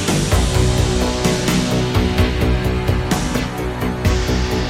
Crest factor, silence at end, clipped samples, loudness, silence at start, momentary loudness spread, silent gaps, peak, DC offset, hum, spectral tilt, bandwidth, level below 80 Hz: 16 dB; 0 s; under 0.1%; -18 LUFS; 0 s; 4 LU; none; -2 dBFS; under 0.1%; none; -5 dB/octave; 16.5 kHz; -22 dBFS